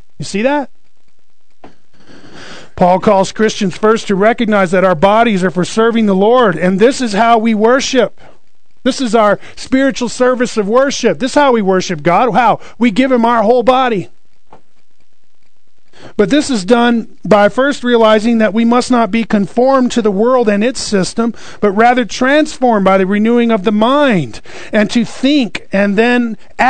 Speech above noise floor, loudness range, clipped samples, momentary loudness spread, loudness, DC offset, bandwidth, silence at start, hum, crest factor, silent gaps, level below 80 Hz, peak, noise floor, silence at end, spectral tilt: 51 dB; 4 LU; 0.4%; 7 LU; -12 LUFS; 4%; 9.4 kHz; 0.2 s; none; 12 dB; none; -44 dBFS; 0 dBFS; -62 dBFS; 0 s; -5 dB/octave